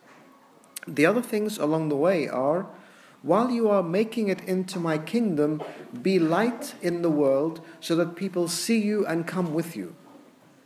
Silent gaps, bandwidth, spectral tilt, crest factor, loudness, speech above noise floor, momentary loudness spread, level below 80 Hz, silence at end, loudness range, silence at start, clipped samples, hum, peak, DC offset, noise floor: none; 15.5 kHz; -5.5 dB/octave; 20 dB; -25 LUFS; 30 dB; 11 LU; -78 dBFS; 0.5 s; 1 LU; 0.85 s; under 0.1%; none; -6 dBFS; under 0.1%; -55 dBFS